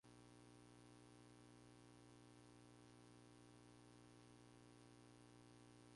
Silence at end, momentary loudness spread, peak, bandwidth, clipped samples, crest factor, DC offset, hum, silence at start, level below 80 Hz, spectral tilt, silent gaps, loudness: 0 s; 0 LU; -54 dBFS; 11.5 kHz; under 0.1%; 12 dB; under 0.1%; 60 Hz at -70 dBFS; 0.05 s; -82 dBFS; -5 dB/octave; none; -67 LUFS